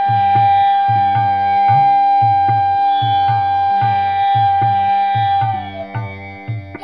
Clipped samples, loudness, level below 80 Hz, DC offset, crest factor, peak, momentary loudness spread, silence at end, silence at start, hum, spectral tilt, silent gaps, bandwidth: under 0.1%; -14 LUFS; -54 dBFS; 0.3%; 10 dB; -4 dBFS; 14 LU; 0 s; 0 s; none; -7.5 dB/octave; none; 5 kHz